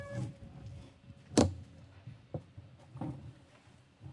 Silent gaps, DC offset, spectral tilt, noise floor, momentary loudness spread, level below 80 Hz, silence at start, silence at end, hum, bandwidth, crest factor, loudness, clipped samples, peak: none; under 0.1%; -5.5 dB/octave; -61 dBFS; 25 LU; -62 dBFS; 0 s; 0 s; none; 11.5 kHz; 28 dB; -36 LUFS; under 0.1%; -10 dBFS